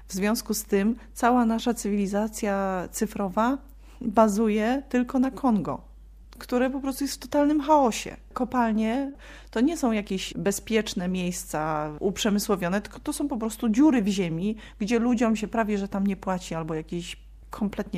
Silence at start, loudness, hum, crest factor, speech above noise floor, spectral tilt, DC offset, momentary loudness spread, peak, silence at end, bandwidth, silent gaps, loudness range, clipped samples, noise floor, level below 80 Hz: 0 s; -26 LUFS; none; 20 dB; 22 dB; -5 dB/octave; under 0.1%; 11 LU; -6 dBFS; 0 s; 15.5 kHz; none; 2 LU; under 0.1%; -47 dBFS; -48 dBFS